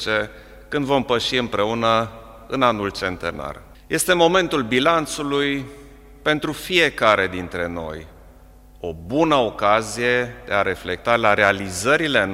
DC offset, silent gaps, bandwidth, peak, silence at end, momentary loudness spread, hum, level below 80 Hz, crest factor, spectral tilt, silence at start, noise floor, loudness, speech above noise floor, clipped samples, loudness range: under 0.1%; none; 16 kHz; 0 dBFS; 0 s; 14 LU; none; -46 dBFS; 20 dB; -4 dB/octave; 0 s; -46 dBFS; -20 LUFS; 26 dB; under 0.1%; 3 LU